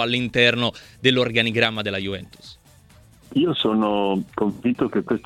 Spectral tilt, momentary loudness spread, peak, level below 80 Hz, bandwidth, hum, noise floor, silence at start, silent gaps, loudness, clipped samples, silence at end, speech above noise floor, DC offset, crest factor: -5.5 dB/octave; 9 LU; -2 dBFS; -54 dBFS; 13.5 kHz; none; -51 dBFS; 0 s; none; -21 LUFS; under 0.1%; 0.05 s; 29 dB; under 0.1%; 20 dB